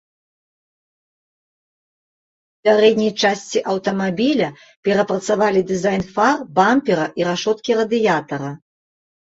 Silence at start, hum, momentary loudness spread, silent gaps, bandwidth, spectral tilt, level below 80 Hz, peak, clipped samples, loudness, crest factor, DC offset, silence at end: 2.65 s; none; 6 LU; 4.76-4.83 s; 8 kHz; -5 dB/octave; -58 dBFS; -2 dBFS; under 0.1%; -18 LUFS; 18 dB; under 0.1%; 0.8 s